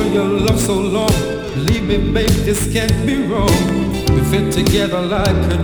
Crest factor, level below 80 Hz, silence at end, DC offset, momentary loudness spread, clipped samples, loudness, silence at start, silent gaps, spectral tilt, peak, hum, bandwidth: 14 dB; -24 dBFS; 0 s; under 0.1%; 3 LU; under 0.1%; -16 LUFS; 0 s; none; -5.5 dB/octave; 0 dBFS; none; over 20 kHz